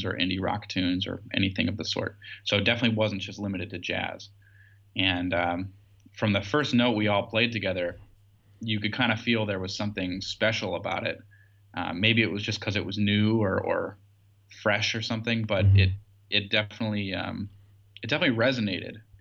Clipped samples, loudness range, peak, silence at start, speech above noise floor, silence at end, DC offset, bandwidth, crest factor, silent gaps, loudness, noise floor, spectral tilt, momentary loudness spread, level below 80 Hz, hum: under 0.1%; 3 LU; -8 dBFS; 0 s; 31 dB; 0.2 s; under 0.1%; 7.4 kHz; 20 dB; none; -27 LUFS; -58 dBFS; -5.5 dB/octave; 12 LU; -60 dBFS; none